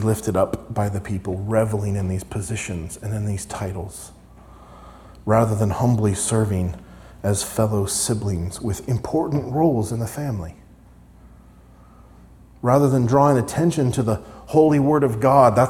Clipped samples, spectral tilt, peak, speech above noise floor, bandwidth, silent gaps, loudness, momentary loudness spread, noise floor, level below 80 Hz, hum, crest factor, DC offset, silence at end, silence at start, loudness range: under 0.1%; -6.5 dB/octave; -2 dBFS; 27 dB; 16.5 kHz; none; -21 LUFS; 12 LU; -47 dBFS; -46 dBFS; none; 18 dB; under 0.1%; 0 s; 0 s; 8 LU